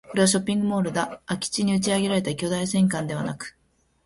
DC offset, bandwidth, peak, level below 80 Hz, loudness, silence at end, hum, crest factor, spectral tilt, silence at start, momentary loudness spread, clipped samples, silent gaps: under 0.1%; 12 kHz; -6 dBFS; -58 dBFS; -24 LUFS; 0.55 s; none; 18 dB; -4.5 dB/octave; 0.05 s; 9 LU; under 0.1%; none